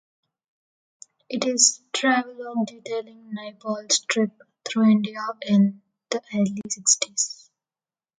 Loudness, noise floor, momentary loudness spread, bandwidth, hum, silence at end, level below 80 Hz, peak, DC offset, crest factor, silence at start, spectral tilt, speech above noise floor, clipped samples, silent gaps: -23 LUFS; under -90 dBFS; 15 LU; 9.6 kHz; none; 0.85 s; -74 dBFS; 0 dBFS; under 0.1%; 24 dB; 1.3 s; -3 dB/octave; over 67 dB; under 0.1%; none